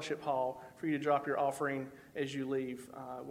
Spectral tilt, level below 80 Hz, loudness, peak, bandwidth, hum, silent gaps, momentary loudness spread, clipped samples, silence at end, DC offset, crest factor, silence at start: -5.5 dB/octave; -74 dBFS; -37 LUFS; -18 dBFS; 16 kHz; none; none; 13 LU; under 0.1%; 0 s; under 0.1%; 18 dB; 0 s